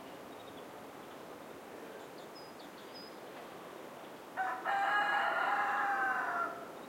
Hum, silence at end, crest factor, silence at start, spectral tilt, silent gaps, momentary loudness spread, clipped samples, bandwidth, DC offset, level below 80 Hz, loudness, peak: none; 0 s; 18 dB; 0 s; -3 dB/octave; none; 18 LU; under 0.1%; 16.5 kHz; under 0.1%; -82 dBFS; -34 LUFS; -20 dBFS